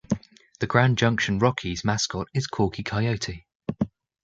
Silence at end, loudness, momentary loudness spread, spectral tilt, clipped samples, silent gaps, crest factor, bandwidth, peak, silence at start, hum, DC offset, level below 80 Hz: 0.35 s; -25 LUFS; 11 LU; -5 dB/octave; under 0.1%; 3.55-3.60 s; 22 dB; 7.8 kHz; -2 dBFS; 0.1 s; none; under 0.1%; -48 dBFS